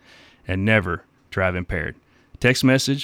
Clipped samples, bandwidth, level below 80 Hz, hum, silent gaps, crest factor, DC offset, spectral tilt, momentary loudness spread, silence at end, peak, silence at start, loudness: under 0.1%; 17 kHz; -42 dBFS; none; none; 18 dB; under 0.1%; -5 dB/octave; 14 LU; 0 s; -4 dBFS; 0.5 s; -21 LUFS